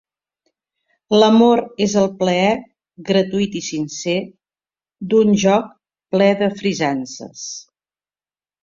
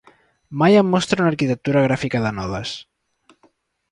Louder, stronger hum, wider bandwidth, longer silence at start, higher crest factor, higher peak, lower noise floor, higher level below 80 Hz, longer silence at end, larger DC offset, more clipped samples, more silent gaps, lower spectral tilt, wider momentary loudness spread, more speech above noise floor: about the same, -17 LUFS vs -19 LUFS; neither; second, 7.6 kHz vs 11 kHz; first, 1.1 s vs 0.5 s; about the same, 18 dB vs 16 dB; first, 0 dBFS vs -4 dBFS; first, under -90 dBFS vs -60 dBFS; second, -58 dBFS vs -50 dBFS; about the same, 1 s vs 1.1 s; neither; neither; neither; about the same, -5 dB/octave vs -6 dB/octave; first, 17 LU vs 14 LU; first, over 74 dB vs 42 dB